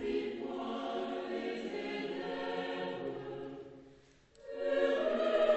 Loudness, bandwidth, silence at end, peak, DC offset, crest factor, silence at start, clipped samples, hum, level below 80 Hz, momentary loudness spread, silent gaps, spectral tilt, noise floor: -37 LUFS; 8.2 kHz; 0 s; -18 dBFS; under 0.1%; 18 dB; 0 s; under 0.1%; none; -70 dBFS; 16 LU; none; -5.5 dB/octave; -62 dBFS